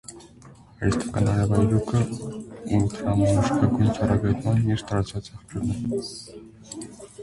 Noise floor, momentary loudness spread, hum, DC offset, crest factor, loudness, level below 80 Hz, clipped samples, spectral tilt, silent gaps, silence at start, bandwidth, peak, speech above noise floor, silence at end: -48 dBFS; 17 LU; none; under 0.1%; 18 dB; -24 LUFS; -42 dBFS; under 0.1%; -7 dB/octave; none; 0.1 s; 11.5 kHz; -6 dBFS; 25 dB; 0 s